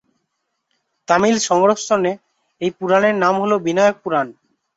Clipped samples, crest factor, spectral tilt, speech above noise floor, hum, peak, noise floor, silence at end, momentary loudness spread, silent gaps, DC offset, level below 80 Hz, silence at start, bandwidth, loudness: under 0.1%; 16 dB; -4.5 dB/octave; 57 dB; none; -2 dBFS; -74 dBFS; 0.45 s; 10 LU; none; under 0.1%; -62 dBFS; 1.1 s; 8 kHz; -17 LUFS